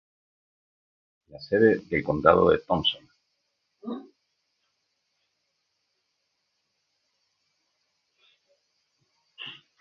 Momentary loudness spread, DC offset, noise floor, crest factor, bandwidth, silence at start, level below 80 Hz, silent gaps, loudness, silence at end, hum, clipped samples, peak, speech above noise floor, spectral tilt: 21 LU; under 0.1%; -77 dBFS; 28 dB; 6.2 kHz; 1.35 s; -56 dBFS; none; -23 LUFS; 0.3 s; none; under 0.1%; -2 dBFS; 54 dB; -7.5 dB/octave